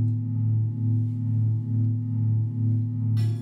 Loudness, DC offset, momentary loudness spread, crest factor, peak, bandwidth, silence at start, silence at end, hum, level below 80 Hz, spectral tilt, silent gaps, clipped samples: -25 LUFS; under 0.1%; 1 LU; 8 dB; -16 dBFS; 5.6 kHz; 0 s; 0 s; none; -66 dBFS; -10.5 dB/octave; none; under 0.1%